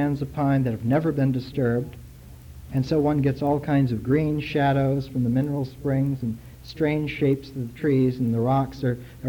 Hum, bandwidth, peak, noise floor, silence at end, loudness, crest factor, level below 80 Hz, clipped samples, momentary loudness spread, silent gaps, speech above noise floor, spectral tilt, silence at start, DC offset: none; 18.5 kHz; -10 dBFS; -43 dBFS; 0 s; -24 LUFS; 14 dB; -46 dBFS; under 0.1%; 7 LU; none; 20 dB; -9 dB/octave; 0 s; under 0.1%